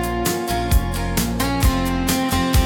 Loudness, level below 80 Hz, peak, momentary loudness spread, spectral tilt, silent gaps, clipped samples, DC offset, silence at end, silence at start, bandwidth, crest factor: -20 LUFS; -24 dBFS; -6 dBFS; 3 LU; -4.5 dB/octave; none; under 0.1%; under 0.1%; 0 s; 0 s; 19.5 kHz; 12 dB